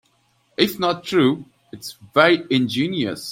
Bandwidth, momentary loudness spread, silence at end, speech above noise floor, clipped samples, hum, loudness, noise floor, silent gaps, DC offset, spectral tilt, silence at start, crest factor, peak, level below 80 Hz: 16.5 kHz; 19 LU; 0 s; 43 dB; under 0.1%; none; -19 LUFS; -63 dBFS; none; under 0.1%; -5 dB/octave; 0.6 s; 20 dB; -2 dBFS; -62 dBFS